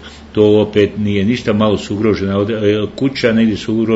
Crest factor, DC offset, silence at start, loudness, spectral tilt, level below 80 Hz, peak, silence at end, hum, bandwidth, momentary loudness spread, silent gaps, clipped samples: 14 dB; under 0.1%; 0 s; -14 LUFS; -7 dB/octave; -44 dBFS; 0 dBFS; 0 s; none; 8 kHz; 5 LU; none; under 0.1%